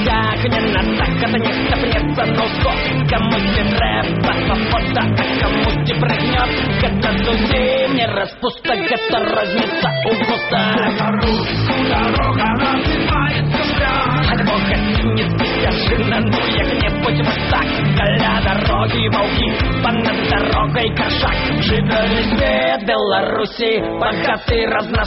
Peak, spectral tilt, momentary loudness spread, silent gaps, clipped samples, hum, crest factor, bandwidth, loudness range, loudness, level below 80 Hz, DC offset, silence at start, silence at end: -4 dBFS; -4 dB/octave; 2 LU; none; under 0.1%; none; 12 dB; 6 kHz; 1 LU; -16 LUFS; -26 dBFS; under 0.1%; 0 s; 0 s